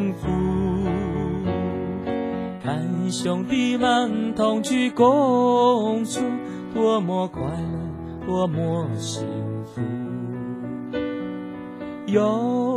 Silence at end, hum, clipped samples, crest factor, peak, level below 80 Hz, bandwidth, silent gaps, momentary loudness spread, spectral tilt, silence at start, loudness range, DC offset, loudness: 0 s; none; under 0.1%; 18 dB; -4 dBFS; -44 dBFS; 12.5 kHz; none; 12 LU; -6 dB/octave; 0 s; 7 LU; under 0.1%; -23 LUFS